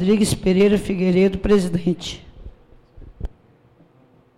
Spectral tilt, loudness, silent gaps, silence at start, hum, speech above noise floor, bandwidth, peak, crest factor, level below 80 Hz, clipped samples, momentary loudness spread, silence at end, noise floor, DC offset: -6 dB/octave; -18 LUFS; none; 0 s; none; 37 dB; 15 kHz; -8 dBFS; 12 dB; -38 dBFS; under 0.1%; 20 LU; 1.1 s; -54 dBFS; under 0.1%